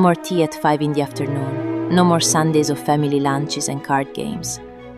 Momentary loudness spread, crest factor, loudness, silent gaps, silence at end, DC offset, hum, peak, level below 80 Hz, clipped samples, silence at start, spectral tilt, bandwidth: 10 LU; 16 dB; -19 LUFS; none; 0 s; under 0.1%; none; -2 dBFS; -54 dBFS; under 0.1%; 0 s; -5 dB/octave; 14.5 kHz